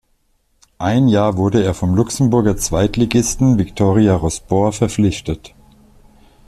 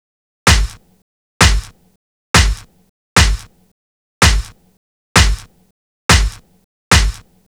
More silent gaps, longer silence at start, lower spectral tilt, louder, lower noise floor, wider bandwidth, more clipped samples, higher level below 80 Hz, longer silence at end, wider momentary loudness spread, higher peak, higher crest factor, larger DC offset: second, none vs 1.02-1.40 s, 1.96-2.34 s, 2.89-3.16 s, 3.71-4.21 s, 4.77-5.15 s, 5.71-6.09 s, 6.64-6.91 s; first, 0.8 s vs 0.45 s; first, -6 dB/octave vs -3 dB/octave; about the same, -16 LUFS vs -14 LUFS; second, -61 dBFS vs under -90 dBFS; second, 13.5 kHz vs over 20 kHz; neither; second, -36 dBFS vs -20 dBFS; first, 1 s vs 0.35 s; second, 5 LU vs 12 LU; about the same, -2 dBFS vs 0 dBFS; about the same, 14 dB vs 16 dB; neither